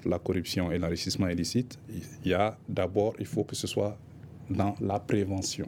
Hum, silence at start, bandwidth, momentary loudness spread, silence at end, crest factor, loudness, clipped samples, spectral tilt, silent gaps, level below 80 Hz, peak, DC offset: none; 0 s; 17 kHz; 10 LU; 0 s; 18 dB; -30 LUFS; under 0.1%; -5.5 dB/octave; none; -54 dBFS; -12 dBFS; under 0.1%